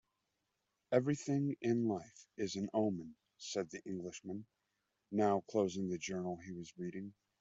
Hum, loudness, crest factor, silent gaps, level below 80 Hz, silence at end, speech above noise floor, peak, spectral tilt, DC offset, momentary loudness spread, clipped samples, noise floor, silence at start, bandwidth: none; -39 LUFS; 22 dB; none; -78 dBFS; 0.3 s; 48 dB; -16 dBFS; -6 dB/octave; under 0.1%; 14 LU; under 0.1%; -86 dBFS; 0.9 s; 8 kHz